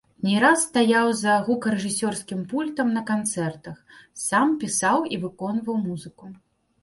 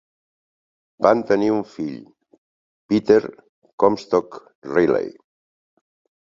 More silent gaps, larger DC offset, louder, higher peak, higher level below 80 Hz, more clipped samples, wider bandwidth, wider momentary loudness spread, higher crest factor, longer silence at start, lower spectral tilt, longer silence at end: second, none vs 2.38-2.89 s, 3.49-3.62 s, 3.73-3.78 s, 4.55-4.62 s; neither; second, -23 LUFS vs -20 LUFS; second, -6 dBFS vs -2 dBFS; about the same, -64 dBFS vs -60 dBFS; neither; first, 12 kHz vs 7.4 kHz; second, 12 LU vs 18 LU; about the same, 18 dB vs 22 dB; second, 0.2 s vs 1 s; second, -4 dB/octave vs -7 dB/octave; second, 0.45 s vs 1.1 s